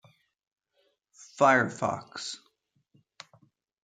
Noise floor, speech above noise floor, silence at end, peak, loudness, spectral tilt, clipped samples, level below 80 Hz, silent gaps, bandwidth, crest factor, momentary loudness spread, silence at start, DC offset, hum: -73 dBFS; 47 dB; 1.45 s; -8 dBFS; -27 LUFS; -4.5 dB/octave; under 0.1%; -78 dBFS; none; 9.4 kHz; 24 dB; 20 LU; 1.35 s; under 0.1%; none